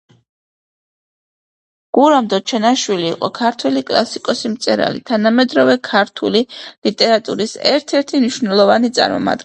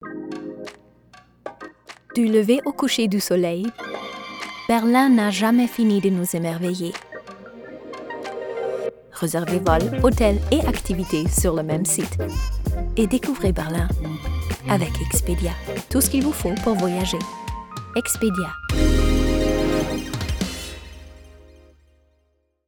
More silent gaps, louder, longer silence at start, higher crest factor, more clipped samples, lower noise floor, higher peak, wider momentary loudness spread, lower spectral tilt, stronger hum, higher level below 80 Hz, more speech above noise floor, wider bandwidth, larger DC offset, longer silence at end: first, 6.78-6.82 s vs none; first, -15 LUFS vs -22 LUFS; first, 1.95 s vs 0 s; about the same, 16 dB vs 18 dB; neither; first, under -90 dBFS vs -67 dBFS; first, 0 dBFS vs -4 dBFS; second, 7 LU vs 16 LU; about the same, -4 dB/octave vs -5 dB/octave; neither; second, -60 dBFS vs -30 dBFS; first, over 75 dB vs 46 dB; second, 9.2 kHz vs over 20 kHz; neither; second, 0 s vs 1.25 s